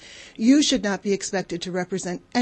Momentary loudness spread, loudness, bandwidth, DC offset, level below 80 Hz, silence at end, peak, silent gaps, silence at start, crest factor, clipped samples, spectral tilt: 11 LU; -23 LUFS; 8.8 kHz; under 0.1%; -56 dBFS; 0 s; -6 dBFS; none; 0 s; 16 dB; under 0.1%; -4 dB/octave